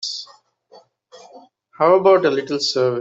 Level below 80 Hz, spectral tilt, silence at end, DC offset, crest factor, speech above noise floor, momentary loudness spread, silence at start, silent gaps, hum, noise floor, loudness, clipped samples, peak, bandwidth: -68 dBFS; -4.5 dB/octave; 0 s; under 0.1%; 16 dB; 35 dB; 12 LU; 0 s; none; none; -51 dBFS; -17 LUFS; under 0.1%; -4 dBFS; 7.8 kHz